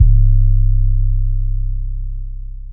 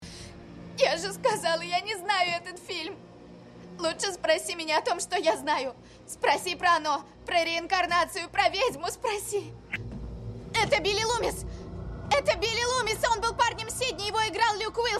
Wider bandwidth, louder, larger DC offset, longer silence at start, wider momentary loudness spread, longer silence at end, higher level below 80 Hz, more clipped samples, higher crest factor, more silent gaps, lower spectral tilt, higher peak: second, 0.3 kHz vs 14 kHz; first, -18 LUFS vs -27 LUFS; neither; about the same, 0 s vs 0 s; about the same, 16 LU vs 15 LU; about the same, 0 s vs 0 s; first, -14 dBFS vs -50 dBFS; neither; second, 12 dB vs 18 dB; neither; first, -23 dB/octave vs -2.5 dB/octave; first, 0 dBFS vs -10 dBFS